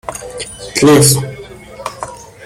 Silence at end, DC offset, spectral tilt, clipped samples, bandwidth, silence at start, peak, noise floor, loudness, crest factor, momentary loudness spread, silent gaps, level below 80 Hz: 0 s; under 0.1%; -4.5 dB/octave; under 0.1%; 17 kHz; 0.1 s; 0 dBFS; -32 dBFS; -10 LUFS; 14 dB; 21 LU; none; -42 dBFS